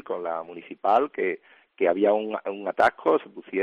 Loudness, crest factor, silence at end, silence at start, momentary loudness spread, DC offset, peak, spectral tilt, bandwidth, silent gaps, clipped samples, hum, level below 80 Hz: -25 LUFS; 18 dB; 0 s; 0.05 s; 10 LU; under 0.1%; -8 dBFS; -6 dB/octave; 9.6 kHz; none; under 0.1%; none; -70 dBFS